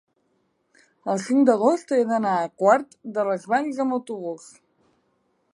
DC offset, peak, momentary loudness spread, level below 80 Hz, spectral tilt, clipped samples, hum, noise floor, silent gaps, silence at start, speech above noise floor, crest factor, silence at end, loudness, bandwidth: under 0.1%; -4 dBFS; 13 LU; -76 dBFS; -6 dB/octave; under 0.1%; none; -69 dBFS; none; 1.05 s; 47 dB; 20 dB; 1.15 s; -22 LUFS; 11.5 kHz